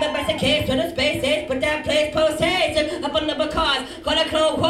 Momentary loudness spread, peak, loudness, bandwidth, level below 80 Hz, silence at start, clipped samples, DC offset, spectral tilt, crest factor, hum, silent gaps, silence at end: 4 LU; -6 dBFS; -20 LUFS; 15 kHz; -42 dBFS; 0 s; under 0.1%; under 0.1%; -4 dB/octave; 14 dB; none; none; 0 s